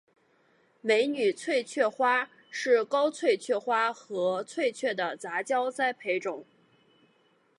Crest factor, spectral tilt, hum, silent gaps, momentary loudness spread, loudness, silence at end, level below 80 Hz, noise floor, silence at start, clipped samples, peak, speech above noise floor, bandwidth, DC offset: 18 dB; -3 dB/octave; none; none; 8 LU; -28 LUFS; 1.15 s; -88 dBFS; -67 dBFS; 0.85 s; under 0.1%; -12 dBFS; 39 dB; 11.5 kHz; under 0.1%